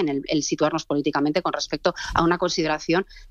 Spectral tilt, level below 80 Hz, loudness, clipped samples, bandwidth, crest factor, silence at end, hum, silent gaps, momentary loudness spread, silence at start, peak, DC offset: -4.5 dB/octave; -46 dBFS; -23 LUFS; under 0.1%; 8.4 kHz; 18 dB; 0.05 s; none; none; 3 LU; 0 s; -6 dBFS; under 0.1%